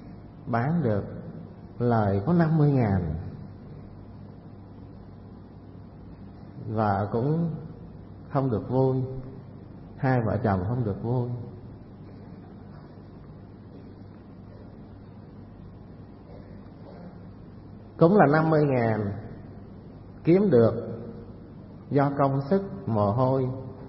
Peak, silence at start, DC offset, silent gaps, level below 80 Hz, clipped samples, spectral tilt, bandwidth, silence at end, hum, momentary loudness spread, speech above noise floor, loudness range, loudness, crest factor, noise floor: -8 dBFS; 0 s; under 0.1%; none; -52 dBFS; under 0.1%; -12.5 dB/octave; 5.8 kHz; 0 s; none; 24 LU; 22 dB; 20 LU; -25 LUFS; 20 dB; -45 dBFS